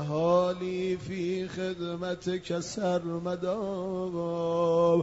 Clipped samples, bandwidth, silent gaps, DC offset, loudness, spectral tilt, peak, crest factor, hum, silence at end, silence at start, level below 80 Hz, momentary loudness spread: under 0.1%; 8 kHz; none; under 0.1%; -30 LUFS; -6.5 dB/octave; -12 dBFS; 16 dB; none; 0 s; 0 s; -60 dBFS; 8 LU